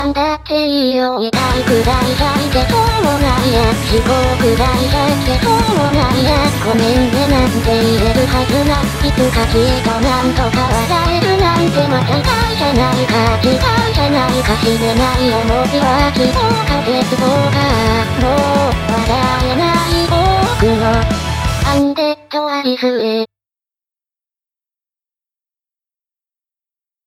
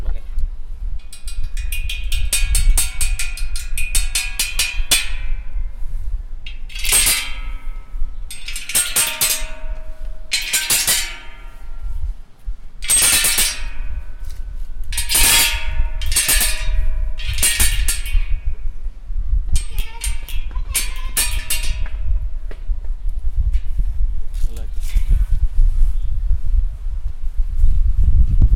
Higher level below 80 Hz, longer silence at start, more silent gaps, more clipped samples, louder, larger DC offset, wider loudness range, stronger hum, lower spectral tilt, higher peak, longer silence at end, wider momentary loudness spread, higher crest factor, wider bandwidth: about the same, -24 dBFS vs -20 dBFS; about the same, 0 s vs 0 s; neither; neither; first, -13 LUFS vs -19 LUFS; neither; second, 3 LU vs 8 LU; neither; first, -5.5 dB/octave vs -1 dB/octave; about the same, 0 dBFS vs 0 dBFS; first, 3.8 s vs 0 s; second, 3 LU vs 19 LU; about the same, 14 dB vs 16 dB; about the same, 16.5 kHz vs 17 kHz